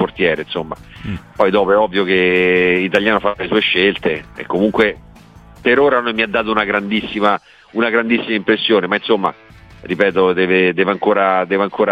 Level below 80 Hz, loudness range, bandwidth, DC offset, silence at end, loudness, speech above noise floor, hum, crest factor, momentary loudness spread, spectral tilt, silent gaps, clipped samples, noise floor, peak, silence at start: -46 dBFS; 2 LU; 8.6 kHz; under 0.1%; 0 s; -15 LUFS; 26 dB; none; 16 dB; 10 LU; -6.5 dB/octave; none; under 0.1%; -41 dBFS; 0 dBFS; 0 s